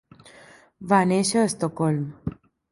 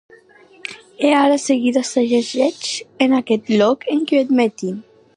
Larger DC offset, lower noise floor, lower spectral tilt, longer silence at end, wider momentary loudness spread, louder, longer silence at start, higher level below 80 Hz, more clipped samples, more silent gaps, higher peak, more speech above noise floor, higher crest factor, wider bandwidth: neither; about the same, -51 dBFS vs -48 dBFS; first, -5.5 dB/octave vs -4 dB/octave; about the same, 0.4 s vs 0.35 s; about the same, 16 LU vs 15 LU; second, -23 LUFS vs -17 LUFS; first, 0.8 s vs 0.65 s; first, -56 dBFS vs -70 dBFS; neither; neither; about the same, -4 dBFS vs -2 dBFS; about the same, 28 dB vs 31 dB; about the same, 20 dB vs 16 dB; about the same, 11.5 kHz vs 11 kHz